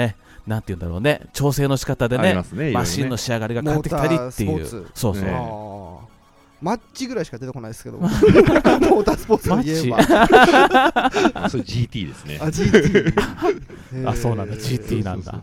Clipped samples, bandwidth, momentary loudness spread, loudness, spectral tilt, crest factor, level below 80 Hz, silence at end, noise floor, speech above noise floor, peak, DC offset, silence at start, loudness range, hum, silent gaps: under 0.1%; 16.5 kHz; 17 LU; -18 LUFS; -6 dB/octave; 18 dB; -38 dBFS; 0 s; -51 dBFS; 33 dB; 0 dBFS; under 0.1%; 0 s; 10 LU; none; none